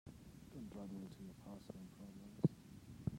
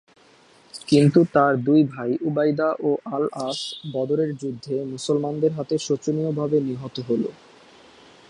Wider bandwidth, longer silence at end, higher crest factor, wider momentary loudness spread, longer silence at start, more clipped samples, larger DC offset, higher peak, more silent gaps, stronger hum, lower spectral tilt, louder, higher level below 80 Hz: first, 16 kHz vs 11 kHz; second, 0 s vs 0.95 s; first, 26 dB vs 18 dB; first, 17 LU vs 11 LU; second, 0.05 s vs 0.75 s; neither; neither; second, -22 dBFS vs -4 dBFS; neither; neither; first, -8.5 dB/octave vs -6.5 dB/octave; second, -48 LUFS vs -22 LUFS; about the same, -68 dBFS vs -64 dBFS